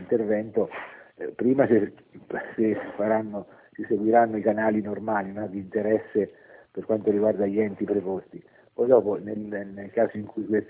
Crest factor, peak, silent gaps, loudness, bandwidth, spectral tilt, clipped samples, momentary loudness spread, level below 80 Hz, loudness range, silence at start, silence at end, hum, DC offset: 20 dB; -6 dBFS; none; -26 LUFS; 4 kHz; -11.5 dB/octave; under 0.1%; 15 LU; -64 dBFS; 2 LU; 0 s; 0.05 s; none; under 0.1%